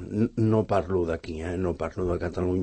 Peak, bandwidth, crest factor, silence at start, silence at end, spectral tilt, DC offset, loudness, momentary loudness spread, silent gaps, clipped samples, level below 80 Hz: -10 dBFS; 8.8 kHz; 18 dB; 0 s; 0 s; -8.5 dB/octave; under 0.1%; -27 LUFS; 7 LU; none; under 0.1%; -44 dBFS